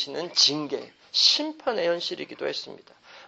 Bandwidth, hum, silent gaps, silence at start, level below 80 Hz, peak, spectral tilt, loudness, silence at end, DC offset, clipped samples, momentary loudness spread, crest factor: 8.4 kHz; none; none; 0 s; -78 dBFS; -6 dBFS; -1.5 dB/octave; -23 LUFS; 0 s; under 0.1%; under 0.1%; 15 LU; 20 dB